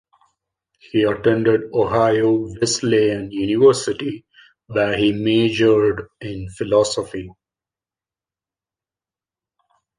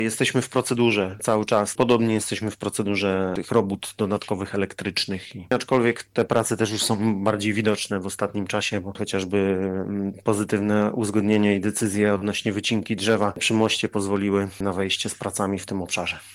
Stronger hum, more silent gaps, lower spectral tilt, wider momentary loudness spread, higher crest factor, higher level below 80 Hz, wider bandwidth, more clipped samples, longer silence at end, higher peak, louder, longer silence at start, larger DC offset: neither; neither; about the same, -5 dB/octave vs -4.5 dB/octave; first, 15 LU vs 7 LU; about the same, 18 dB vs 16 dB; first, -50 dBFS vs -62 dBFS; second, 10.5 kHz vs 15.5 kHz; neither; first, 2.65 s vs 0 s; first, -2 dBFS vs -6 dBFS; first, -18 LUFS vs -23 LUFS; first, 0.95 s vs 0 s; neither